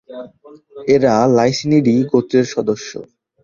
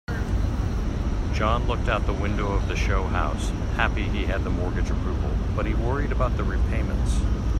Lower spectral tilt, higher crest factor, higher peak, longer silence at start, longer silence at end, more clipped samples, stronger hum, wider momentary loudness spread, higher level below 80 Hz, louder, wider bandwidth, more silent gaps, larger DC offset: about the same, -6 dB/octave vs -6.5 dB/octave; about the same, 14 dB vs 16 dB; first, -2 dBFS vs -6 dBFS; about the same, 0.1 s vs 0.1 s; first, 0.4 s vs 0 s; neither; neither; first, 19 LU vs 3 LU; second, -54 dBFS vs -26 dBFS; first, -15 LUFS vs -26 LUFS; second, 7.4 kHz vs 9.8 kHz; neither; neither